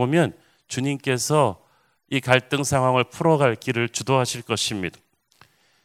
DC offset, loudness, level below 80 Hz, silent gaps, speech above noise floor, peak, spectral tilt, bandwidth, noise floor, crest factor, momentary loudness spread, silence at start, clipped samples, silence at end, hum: under 0.1%; -22 LUFS; -54 dBFS; none; 41 dB; 0 dBFS; -4.5 dB/octave; 16 kHz; -62 dBFS; 22 dB; 8 LU; 0 s; under 0.1%; 0.95 s; none